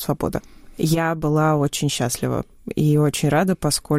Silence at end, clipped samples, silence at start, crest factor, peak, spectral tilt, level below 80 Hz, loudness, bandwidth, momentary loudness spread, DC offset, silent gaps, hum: 0 s; under 0.1%; 0 s; 12 dB; -8 dBFS; -5.5 dB/octave; -44 dBFS; -21 LUFS; 16 kHz; 8 LU; under 0.1%; none; none